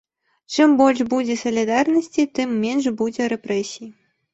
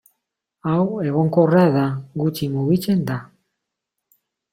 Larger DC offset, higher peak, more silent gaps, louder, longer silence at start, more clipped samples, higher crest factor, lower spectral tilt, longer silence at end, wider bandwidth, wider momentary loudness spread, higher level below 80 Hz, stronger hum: neither; about the same, -2 dBFS vs -4 dBFS; neither; about the same, -20 LUFS vs -20 LUFS; second, 0.5 s vs 0.65 s; neither; about the same, 18 dB vs 18 dB; second, -4.5 dB/octave vs -8 dB/octave; second, 0.4 s vs 1.25 s; second, 8.2 kHz vs 16 kHz; about the same, 9 LU vs 10 LU; about the same, -62 dBFS vs -58 dBFS; neither